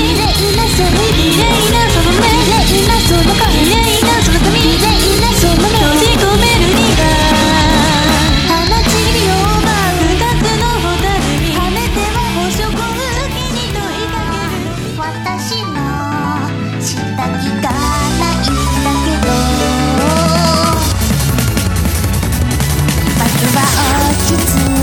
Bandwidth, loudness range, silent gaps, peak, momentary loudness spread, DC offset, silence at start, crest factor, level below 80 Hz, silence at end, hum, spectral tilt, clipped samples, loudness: 19 kHz; 7 LU; none; 0 dBFS; 8 LU; under 0.1%; 0 s; 12 dB; -20 dBFS; 0 s; none; -4 dB/octave; under 0.1%; -12 LUFS